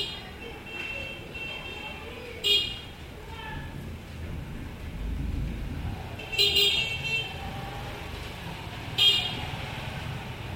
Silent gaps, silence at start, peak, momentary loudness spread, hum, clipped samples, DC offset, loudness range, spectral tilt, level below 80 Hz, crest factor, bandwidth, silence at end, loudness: none; 0 s; -10 dBFS; 18 LU; none; under 0.1%; under 0.1%; 10 LU; -3 dB/octave; -42 dBFS; 22 dB; 16.5 kHz; 0 s; -28 LUFS